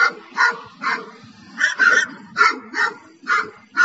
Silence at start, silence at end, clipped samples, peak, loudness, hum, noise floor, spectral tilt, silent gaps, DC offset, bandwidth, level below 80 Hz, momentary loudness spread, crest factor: 0 s; 0 s; under 0.1%; -2 dBFS; -19 LUFS; none; -42 dBFS; -1 dB/octave; none; under 0.1%; 8.2 kHz; -74 dBFS; 11 LU; 18 dB